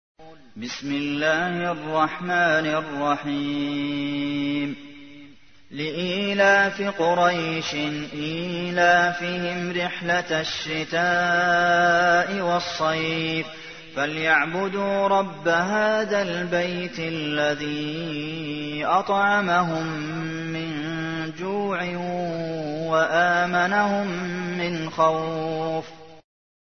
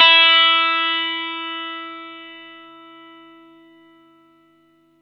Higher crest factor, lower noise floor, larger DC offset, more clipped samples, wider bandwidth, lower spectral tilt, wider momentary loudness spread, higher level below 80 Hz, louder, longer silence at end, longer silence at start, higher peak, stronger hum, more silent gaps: about the same, 18 dB vs 20 dB; second, -50 dBFS vs -57 dBFS; first, 0.3% vs under 0.1%; neither; about the same, 6.6 kHz vs 6.2 kHz; first, -5 dB/octave vs -1.5 dB/octave; second, 10 LU vs 27 LU; first, -60 dBFS vs -84 dBFS; second, -23 LUFS vs -15 LUFS; second, 0.4 s vs 2.45 s; first, 0.2 s vs 0 s; second, -6 dBFS vs 0 dBFS; second, none vs 50 Hz at -70 dBFS; neither